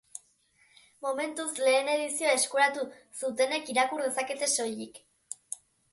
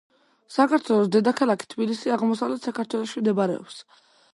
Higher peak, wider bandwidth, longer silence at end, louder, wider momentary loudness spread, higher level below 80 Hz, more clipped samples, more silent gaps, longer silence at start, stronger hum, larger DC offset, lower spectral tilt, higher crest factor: second, -12 dBFS vs -6 dBFS; about the same, 12 kHz vs 11.5 kHz; second, 0.4 s vs 0.55 s; second, -29 LUFS vs -24 LUFS; first, 17 LU vs 9 LU; about the same, -80 dBFS vs -76 dBFS; neither; neither; first, 1 s vs 0.5 s; neither; neither; second, -0.5 dB/octave vs -6 dB/octave; about the same, 18 dB vs 18 dB